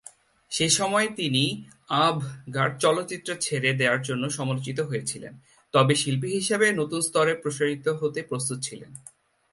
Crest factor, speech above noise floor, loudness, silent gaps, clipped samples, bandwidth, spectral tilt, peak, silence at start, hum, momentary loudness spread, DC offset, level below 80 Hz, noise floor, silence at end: 20 dB; 25 dB; -25 LUFS; none; under 0.1%; 12 kHz; -3.5 dB/octave; -6 dBFS; 0.5 s; none; 11 LU; under 0.1%; -66 dBFS; -51 dBFS; 0.55 s